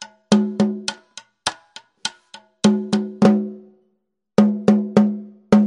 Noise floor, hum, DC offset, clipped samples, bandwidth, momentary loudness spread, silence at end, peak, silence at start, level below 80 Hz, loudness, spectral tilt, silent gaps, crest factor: -71 dBFS; none; under 0.1%; under 0.1%; 11 kHz; 13 LU; 0 s; 0 dBFS; 0 s; -58 dBFS; -19 LUFS; -6 dB/octave; none; 20 dB